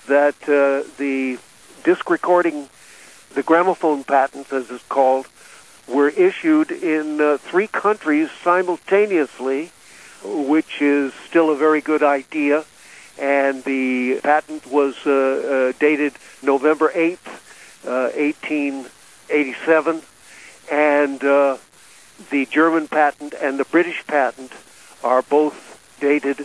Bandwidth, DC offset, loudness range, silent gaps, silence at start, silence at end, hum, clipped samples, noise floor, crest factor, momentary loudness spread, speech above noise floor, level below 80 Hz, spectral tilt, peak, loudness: 11 kHz; under 0.1%; 2 LU; none; 0.05 s; 0 s; none; under 0.1%; -47 dBFS; 16 dB; 10 LU; 29 dB; -68 dBFS; -5 dB/octave; -2 dBFS; -19 LUFS